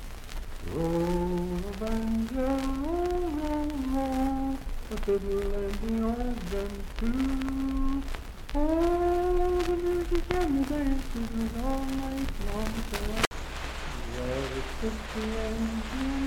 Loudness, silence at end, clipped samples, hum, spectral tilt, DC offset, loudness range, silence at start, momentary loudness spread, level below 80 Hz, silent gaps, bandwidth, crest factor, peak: -31 LUFS; 0 s; under 0.1%; none; -6 dB/octave; under 0.1%; 5 LU; 0 s; 9 LU; -34 dBFS; 13.27-13.31 s; 17 kHz; 20 dB; -8 dBFS